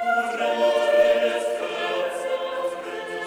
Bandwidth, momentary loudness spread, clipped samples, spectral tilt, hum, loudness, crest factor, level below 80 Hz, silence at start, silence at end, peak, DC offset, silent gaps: over 20 kHz; 10 LU; under 0.1%; -2.5 dB/octave; none; -23 LUFS; 14 dB; -68 dBFS; 0 s; 0 s; -8 dBFS; under 0.1%; none